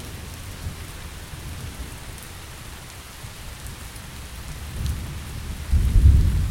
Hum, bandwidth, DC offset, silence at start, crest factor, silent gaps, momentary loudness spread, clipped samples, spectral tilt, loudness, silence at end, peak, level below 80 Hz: none; 16.5 kHz; under 0.1%; 0 s; 22 dB; none; 20 LU; under 0.1%; -5.5 dB/octave; -27 LUFS; 0 s; -4 dBFS; -26 dBFS